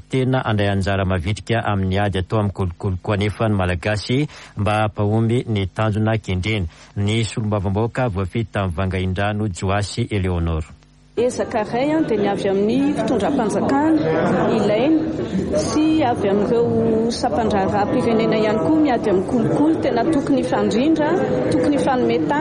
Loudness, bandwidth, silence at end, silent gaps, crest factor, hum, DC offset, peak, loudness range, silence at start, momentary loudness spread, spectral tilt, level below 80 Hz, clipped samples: -19 LUFS; 11.5 kHz; 0 s; none; 12 dB; none; under 0.1%; -6 dBFS; 4 LU; 0.1 s; 6 LU; -7 dB/octave; -40 dBFS; under 0.1%